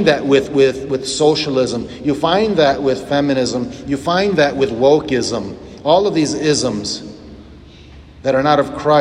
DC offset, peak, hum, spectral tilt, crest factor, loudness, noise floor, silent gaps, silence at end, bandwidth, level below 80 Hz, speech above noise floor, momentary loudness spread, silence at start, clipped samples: under 0.1%; 0 dBFS; none; -4.5 dB/octave; 16 dB; -16 LUFS; -39 dBFS; none; 0 s; 11 kHz; -44 dBFS; 24 dB; 9 LU; 0 s; under 0.1%